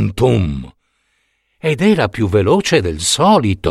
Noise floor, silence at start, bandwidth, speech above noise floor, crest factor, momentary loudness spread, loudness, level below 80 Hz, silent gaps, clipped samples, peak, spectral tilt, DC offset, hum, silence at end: -64 dBFS; 0 s; 14 kHz; 50 dB; 14 dB; 9 LU; -14 LUFS; -36 dBFS; none; under 0.1%; 0 dBFS; -5 dB/octave; under 0.1%; none; 0 s